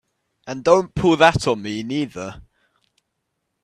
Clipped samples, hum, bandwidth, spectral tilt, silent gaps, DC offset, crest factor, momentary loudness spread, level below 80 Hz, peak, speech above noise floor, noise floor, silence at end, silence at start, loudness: under 0.1%; none; 12 kHz; -5.5 dB/octave; none; under 0.1%; 22 dB; 19 LU; -46 dBFS; 0 dBFS; 57 dB; -76 dBFS; 1.2 s; 0.45 s; -19 LUFS